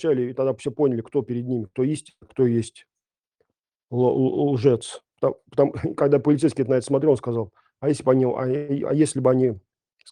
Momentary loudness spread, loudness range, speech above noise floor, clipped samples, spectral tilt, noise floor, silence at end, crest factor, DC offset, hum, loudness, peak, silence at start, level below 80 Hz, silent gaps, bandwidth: 8 LU; 4 LU; 52 dB; under 0.1%; -7.5 dB/octave; -74 dBFS; 0.5 s; 18 dB; under 0.1%; none; -22 LUFS; -4 dBFS; 0 s; -62 dBFS; none; 10.5 kHz